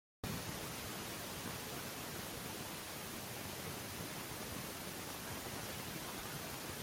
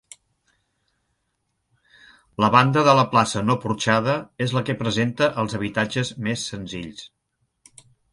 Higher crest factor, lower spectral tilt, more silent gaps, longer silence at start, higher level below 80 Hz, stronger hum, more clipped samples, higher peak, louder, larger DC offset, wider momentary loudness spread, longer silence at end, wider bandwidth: second, 18 dB vs 24 dB; second, -3 dB/octave vs -5 dB/octave; neither; second, 0.25 s vs 2.4 s; second, -64 dBFS vs -56 dBFS; neither; neither; second, -28 dBFS vs 0 dBFS; second, -44 LUFS vs -21 LUFS; neither; second, 1 LU vs 16 LU; second, 0 s vs 1.05 s; first, 16.5 kHz vs 11.5 kHz